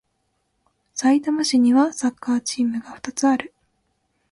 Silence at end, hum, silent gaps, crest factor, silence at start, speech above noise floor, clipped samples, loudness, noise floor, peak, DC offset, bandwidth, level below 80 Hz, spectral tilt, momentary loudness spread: 0.85 s; none; none; 16 dB; 0.95 s; 51 dB; under 0.1%; -21 LUFS; -71 dBFS; -6 dBFS; under 0.1%; 11.5 kHz; -66 dBFS; -3 dB/octave; 13 LU